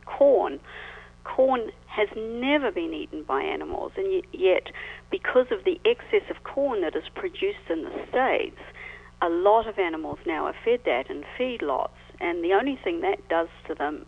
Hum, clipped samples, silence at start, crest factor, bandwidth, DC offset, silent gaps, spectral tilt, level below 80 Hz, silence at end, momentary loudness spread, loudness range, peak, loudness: 60 Hz at -55 dBFS; under 0.1%; 0.05 s; 18 dB; 7.6 kHz; under 0.1%; none; -6 dB/octave; -54 dBFS; 0.05 s; 12 LU; 2 LU; -8 dBFS; -26 LUFS